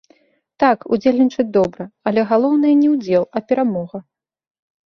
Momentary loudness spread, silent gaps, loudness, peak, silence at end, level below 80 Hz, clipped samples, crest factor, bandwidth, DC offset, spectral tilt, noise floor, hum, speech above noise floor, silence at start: 9 LU; none; -17 LUFS; -2 dBFS; 0.85 s; -58 dBFS; under 0.1%; 16 dB; 6.4 kHz; under 0.1%; -7.5 dB/octave; -56 dBFS; none; 40 dB; 0.6 s